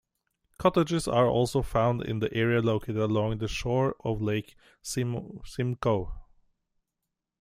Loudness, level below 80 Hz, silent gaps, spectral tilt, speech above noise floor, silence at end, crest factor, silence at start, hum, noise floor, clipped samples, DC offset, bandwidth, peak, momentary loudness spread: -28 LUFS; -46 dBFS; none; -6.5 dB/octave; 58 dB; 1.2 s; 20 dB; 0.6 s; none; -85 dBFS; under 0.1%; under 0.1%; 15 kHz; -8 dBFS; 9 LU